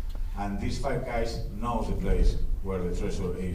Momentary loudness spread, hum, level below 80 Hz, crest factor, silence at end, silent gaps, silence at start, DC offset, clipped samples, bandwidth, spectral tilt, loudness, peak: 6 LU; none; -30 dBFS; 14 dB; 0 s; none; 0 s; under 0.1%; under 0.1%; 11 kHz; -6.5 dB/octave; -32 LUFS; -12 dBFS